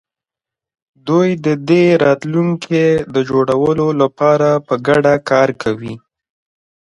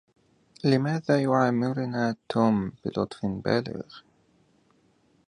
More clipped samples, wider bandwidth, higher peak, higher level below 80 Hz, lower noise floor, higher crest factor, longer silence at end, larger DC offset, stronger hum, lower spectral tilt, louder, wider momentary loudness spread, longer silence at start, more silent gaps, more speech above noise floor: neither; about the same, 11 kHz vs 10.5 kHz; first, 0 dBFS vs -8 dBFS; first, -52 dBFS vs -60 dBFS; first, -87 dBFS vs -65 dBFS; second, 14 dB vs 20 dB; second, 0.95 s vs 1.3 s; neither; neither; about the same, -7 dB/octave vs -7.5 dB/octave; first, -14 LUFS vs -26 LUFS; about the same, 8 LU vs 8 LU; first, 1.05 s vs 0.65 s; neither; first, 73 dB vs 39 dB